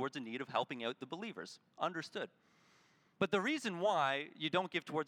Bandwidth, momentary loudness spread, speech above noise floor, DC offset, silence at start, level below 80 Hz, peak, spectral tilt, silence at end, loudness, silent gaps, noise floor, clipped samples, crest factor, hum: 14.5 kHz; 11 LU; 32 dB; under 0.1%; 0 s; -88 dBFS; -18 dBFS; -4.5 dB/octave; 0 s; -38 LUFS; none; -71 dBFS; under 0.1%; 20 dB; none